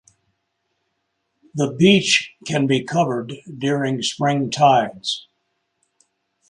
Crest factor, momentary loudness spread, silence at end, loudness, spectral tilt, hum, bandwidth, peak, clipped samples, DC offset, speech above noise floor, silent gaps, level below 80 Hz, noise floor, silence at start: 20 dB; 12 LU; 1.3 s; -19 LUFS; -4.5 dB/octave; none; 11.5 kHz; -2 dBFS; under 0.1%; under 0.1%; 54 dB; none; -62 dBFS; -73 dBFS; 1.55 s